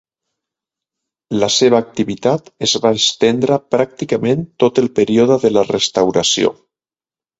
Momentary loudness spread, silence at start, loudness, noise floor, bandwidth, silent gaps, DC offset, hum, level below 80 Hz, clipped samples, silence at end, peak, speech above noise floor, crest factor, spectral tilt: 6 LU; 1.3 s; -15 LUFS; under -90 dBFS; 8 kHz; none; under 0.1%; none; -54 dBFS; under 0.1%; 0.85 s; 0 dBFS; over 75 dB; 16 dB; -4 dB/octave